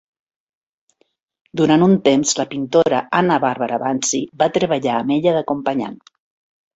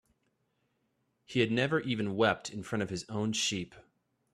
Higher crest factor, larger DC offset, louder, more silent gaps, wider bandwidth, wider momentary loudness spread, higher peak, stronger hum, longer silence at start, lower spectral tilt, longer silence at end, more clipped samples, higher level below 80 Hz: second, 16 dB vs 24 dB; neither; first, -17 LUFS vs -32 LUFS; neither; second, 8.2 kHz vs 13.5 kHz; about the same, 7 LU vs 8 LU; first, -2 dBFS vs -10 dBFS; neither; first, 1.55 s vs 1.3 s; about the same, -4.5 dB/octave vs -4.5 dB/octave; first, 0.8 s vs 0.55 s; neither; first, -60 dBFS vs -68 dBFS